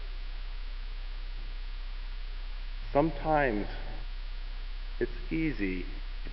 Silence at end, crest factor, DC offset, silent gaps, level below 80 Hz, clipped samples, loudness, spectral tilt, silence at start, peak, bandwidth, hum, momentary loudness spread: 0 s; 20 dB; under 0.1%; none; -36 dBFS; under 0.1%; -35 LUFS; -9.5 dB/octave; 0 s; -12 dBFS; 5.8 kHz; none; 15 LU